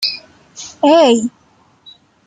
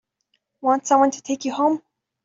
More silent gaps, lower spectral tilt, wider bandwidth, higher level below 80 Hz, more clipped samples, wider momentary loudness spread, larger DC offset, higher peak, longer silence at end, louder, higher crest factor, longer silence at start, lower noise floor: neither; about the same, -3.5 dB/octave vs -3.5 dB/octave; first, 13.5 kHz vs 7.8 kHz; first, -62 dBFS vs -70 dBFS; neither; first, 22 LU vs 9 LU; neither; about the same, -2 dBFS vs -4 dBFS; first, 1 s vs 0.45 s; first, -13 LUFS vs -21 LUFS; about the same, 14 dB vs 18 dB; second, 0 s vs 0.65 s; second, -49 dBFS vs -72 dBFS